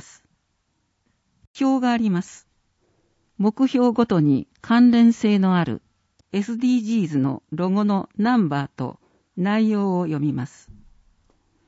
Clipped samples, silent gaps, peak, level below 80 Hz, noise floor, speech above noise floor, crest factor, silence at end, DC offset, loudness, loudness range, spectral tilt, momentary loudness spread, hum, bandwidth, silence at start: under 0.1%; none; -6 dBFS; -60 dBFS; -71 dBFS; 51 dB; 16 dB; 1.2 s; under 0.1%; -21 LUFS; 6 LU; -7.5 dB/octave; 12 LU; none; 8 kHz; 1.55 s